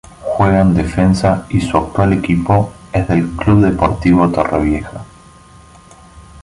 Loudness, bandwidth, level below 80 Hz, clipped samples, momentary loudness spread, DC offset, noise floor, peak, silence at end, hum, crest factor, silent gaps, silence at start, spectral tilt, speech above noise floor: -14 LUFS; 11.5 kHz; -30 dBFS; under 0.1%; 8 LU; under 0.1%; -41 dBFS; -2 dBFS; 0 s; none; 12 dB; none; 0.2 s; -8 dB/octave; 28 dB